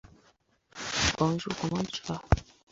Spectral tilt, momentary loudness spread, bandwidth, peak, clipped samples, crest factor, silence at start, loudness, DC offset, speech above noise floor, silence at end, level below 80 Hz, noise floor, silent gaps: -4 dB/octave; 10 LU; 8 kHz; -4 dBFS; under 0.1%; 28 dB; 0.75 s; -30 LUFS; under 0.1%; 37 dB; 0.3 s; -40 dBFS; -67 dBFS; none